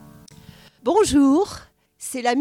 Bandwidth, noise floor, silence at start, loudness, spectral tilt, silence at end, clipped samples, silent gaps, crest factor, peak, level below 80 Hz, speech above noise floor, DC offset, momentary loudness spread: 15 kHz; -47 dBFS; 0.85 s; -20 LUFS; -4 dB/octave; 0 s; under 0.1%; none; 16 dB; -6 dBFS; -48 dBFS; 29 dB; under 0.1%; 17 LU